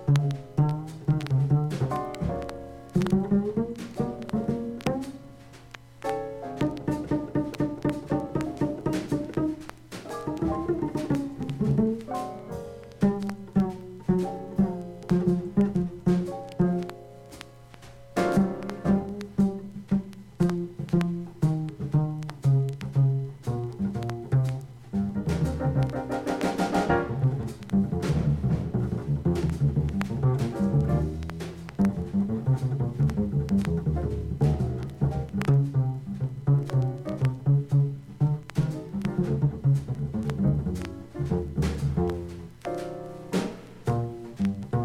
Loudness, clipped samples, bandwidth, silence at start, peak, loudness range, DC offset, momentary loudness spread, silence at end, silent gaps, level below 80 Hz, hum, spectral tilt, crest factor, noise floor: -28 LUFS; under 0.1%; 12.5 kHz; 0 s; -8 dBFS; 4 LU; under 0.1%; 10 LU; 0 s; none; -42 dBFS; none; -8.5 dB/octave; 20 dB; -47 dBFS